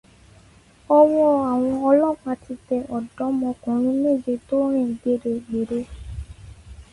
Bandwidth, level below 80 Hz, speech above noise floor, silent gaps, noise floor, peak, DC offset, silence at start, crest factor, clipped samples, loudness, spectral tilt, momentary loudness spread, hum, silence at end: 11.5 kHz; -46 dBFS; 31 dB; none; -52 dBFS; -4 dBFS; under 0.1%; 0.9 s; 18 dB; under 0.1%; -21 LUFS; -8.5 dB/octave; 14 LU; none; 0.1 s